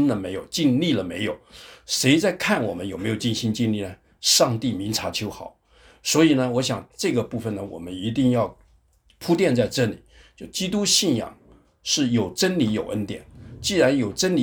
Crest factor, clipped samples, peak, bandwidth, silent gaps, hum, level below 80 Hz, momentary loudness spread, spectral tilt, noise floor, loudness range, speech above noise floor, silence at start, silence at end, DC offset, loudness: 20 dB; under 0.1%; -4 dBFS; over 20 kHz; none; none; -54 dBFS; 15 LU; -4 dB/octave; -59 dBFS; 3 LU; 37 dB; 0 s; 0 s; under 0.1%; -22 LUFS